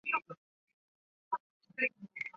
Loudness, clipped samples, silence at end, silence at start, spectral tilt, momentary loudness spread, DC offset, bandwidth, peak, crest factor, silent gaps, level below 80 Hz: -37 LUFS; under 0.1%; 0.05 s; 0.05 s; -2 dB/octave; 17 LU; under 0.1%; 7.4 kHz; -18 dBFS; 24 dB; 0.37-0.67 s, 0.73-1.31 s, 1.40-1.60 s; -86 dBFS